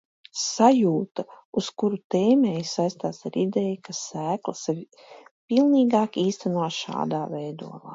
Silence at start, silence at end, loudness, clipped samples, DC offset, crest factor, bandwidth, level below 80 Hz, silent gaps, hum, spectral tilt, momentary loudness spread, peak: 0.35 s; 0 s; -24 LUFS; under 0.1%; under 0.1%; 20 dB; 8 kHz; -72 dBFS; 1.45-1.53 s, 2.04-2.10 s, 5.31-5.48 s; none; -5.5 dB/octave; 13 LU; -4 dBFS